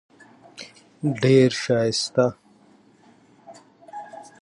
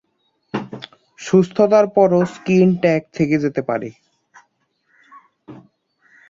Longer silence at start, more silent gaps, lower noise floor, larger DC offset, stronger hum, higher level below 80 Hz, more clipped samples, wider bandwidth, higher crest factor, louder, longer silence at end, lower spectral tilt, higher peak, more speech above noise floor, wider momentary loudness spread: about the same, 0.6 s vs 0.55 s; neither; second, -55 dBFS vs -67 dBFS; neither; neither; second, -66 dBFS vs -60 dBFS; neither; first, 11 kHz vs 7.6 kHz; about the same, 20 dB vs 18 dB; second, -21 LUFS vs -17 LUFS; second, 0.2 s vs 0.75 s; second, -5.5 dB/octave vs -7.5 dB/octave; about the same, -4 dBFS vs -2 dBFS; second, 36 dB vs 51 dB; first, 24 LU vs 20 LU